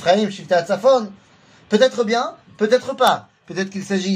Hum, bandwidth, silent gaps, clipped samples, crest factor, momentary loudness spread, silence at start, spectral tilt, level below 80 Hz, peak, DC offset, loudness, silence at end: none; 15.5 kHz; none; under 0.1%; 18 dB; 10 LU; 0 s; -4.5 dB/octave; -66 dBFS; -2 dBFS; under 0.1%; -19 LUFS; 0 s